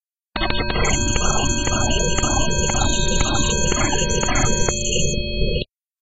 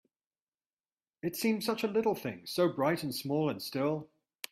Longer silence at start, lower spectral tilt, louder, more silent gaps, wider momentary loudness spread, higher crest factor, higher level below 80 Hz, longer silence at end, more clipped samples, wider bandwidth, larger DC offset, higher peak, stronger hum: second, 0.35 s vs 1.25 s; second, -3 dB/octave vs -5 dB/octave; first, -20 LUFS vs -33 LUFS; neither; second, 4 LU vs 8 LU; about the same, 18 dB vs 18 dB; first, -24 dBFS vs -74 dBFS; about the same, 0.4 s vs 0.45 s; neither; second, 8.2 kHz vs 16 kHz; neither; first, -2 dBFS vs -16 dBFS; neither